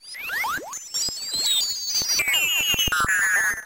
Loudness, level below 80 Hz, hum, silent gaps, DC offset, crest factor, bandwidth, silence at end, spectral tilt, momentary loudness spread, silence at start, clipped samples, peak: -21 LUFS; -46 dBFS; none; none; under 0.1%; 14 dB; 17 kHz; 0 s; 1 dB/octave; 8 LU; 0.05 s; under 0.1%; -10 dBFS